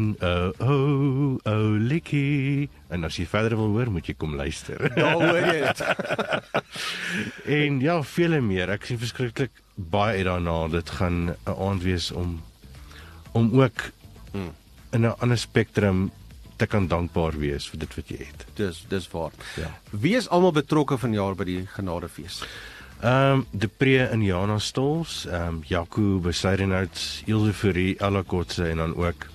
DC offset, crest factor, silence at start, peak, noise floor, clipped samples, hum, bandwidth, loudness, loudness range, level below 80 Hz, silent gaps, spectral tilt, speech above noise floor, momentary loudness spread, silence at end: under 0.1%; 20 dB; 0 s; -6 dBFS; -45 dBFS; under 0.1%; none; 13 kHz; -25 LUFS; 3 LU; -44 dBFS; none; -6 dB/octave; 21 dB; 13 LU; 0.05 s